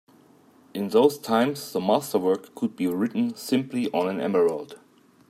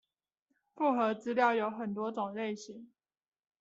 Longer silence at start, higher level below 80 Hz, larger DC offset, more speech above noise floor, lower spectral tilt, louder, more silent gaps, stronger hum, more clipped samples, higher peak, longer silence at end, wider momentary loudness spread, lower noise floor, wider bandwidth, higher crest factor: about the same, 0.75 s vs 0.75 s; first, -74 dBFS vs -84 dBFS; neither; second, 32 dB vs 50 dB; first, -5.5 dB/octave vs -4 dB/octave; first, -25 LUFS vs -33 LUFS; neither; neither; neither; first, -6 dBFS vs -16 dBFS; second, 0.55 s vs 0.75 s; second, 10 LU vs 14 LU; second, -56 dBFS vs -83 dBFS; first, 15.5 kHz vs 8 kHz; about the same, 18 dB vs 20 dB